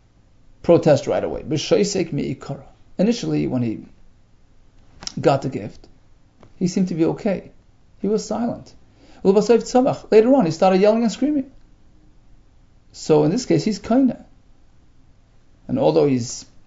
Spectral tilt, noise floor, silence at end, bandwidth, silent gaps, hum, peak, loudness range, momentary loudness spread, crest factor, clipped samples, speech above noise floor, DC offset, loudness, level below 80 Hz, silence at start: -6.5 dB/octave; -51 dBFS; 0.25 s; 8 kHz; none; none; -2 dBFS; 7 LU; 16 LU; 18 dB; under 0.1%; 33 dB; under 0.1%; -19 LUFS; -50 dBFS; 0.65 s